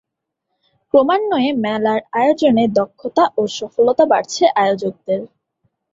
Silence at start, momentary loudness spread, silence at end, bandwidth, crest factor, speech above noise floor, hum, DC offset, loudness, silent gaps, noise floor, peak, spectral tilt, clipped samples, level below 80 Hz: 0.95 s; 8 LU; 0.65 s; 7.8 kHz; 16 dB; 61 dB; none; under 0.1%; -16 LUFS; none; -76 dBFS; 0 dBFS; -5 dB/octave; under 0.1%; -60 dBFS